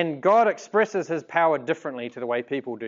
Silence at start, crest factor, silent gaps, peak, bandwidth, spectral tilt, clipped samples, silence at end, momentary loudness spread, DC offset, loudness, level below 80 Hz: 0 s; 18 dB; none; -6 dBFS; 7.6 kHz; -5.5 dB/octave; under 0.1%; 0 s; 11 LU; under 0.1%; -24 LUFS; -82 dBFS